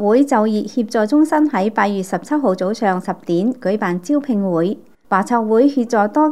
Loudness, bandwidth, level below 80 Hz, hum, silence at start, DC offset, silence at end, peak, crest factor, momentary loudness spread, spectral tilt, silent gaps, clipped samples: -17 LUFS; 13 kHz; -68 dBFS; none; 0 s; 0.5%; 0 s; 0 dBFS; 16 dB; 6 LU; -6.5 dB/octave; none; under 0.1%